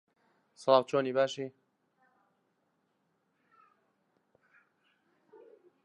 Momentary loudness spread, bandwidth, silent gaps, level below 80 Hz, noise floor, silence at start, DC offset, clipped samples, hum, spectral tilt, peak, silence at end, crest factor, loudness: 15 LU; 8.8 kHz; none; under -90 dBFS; -77 dBFS; 0.6 s; under 0.1%; under 0.1%; none; -5 dB/octave; -10 dBFS; 4.35 s; 26 dB; -30 LUFS